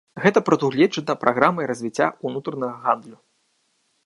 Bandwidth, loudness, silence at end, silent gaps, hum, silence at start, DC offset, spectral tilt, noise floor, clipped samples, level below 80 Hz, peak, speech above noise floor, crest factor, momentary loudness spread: 11.5 kHz; -21 LUFS; 0.9 s; none; none; 0.15 s; under 0.1%; -6 dB/octave; -68 dBFS; under 0.1%; -70 dBFS; 0 dBFS; 47 dB; 22 dB; 9 LU